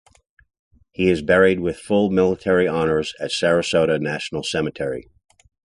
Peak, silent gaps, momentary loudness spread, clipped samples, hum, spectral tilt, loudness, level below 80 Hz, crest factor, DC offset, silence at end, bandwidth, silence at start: -2 dBFS; none; 9 LU; under 0.1%; none; -5.5 dB/octave; -20 LUFS; -48 dBFS; 18 dB; under 0.1%; 0.75 s; 11.5 kHz; 1 s